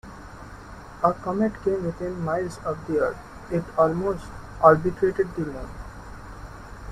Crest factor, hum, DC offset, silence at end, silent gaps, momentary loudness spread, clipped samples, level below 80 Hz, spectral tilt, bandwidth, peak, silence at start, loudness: 22 dB; none; under 0.1%; 0 s; none; 22 LU; under 0.1%; -44 dBFS; -8 dB/octave; 13.5 kHz; -2 dBFS; 0.05 s; -24 LUFS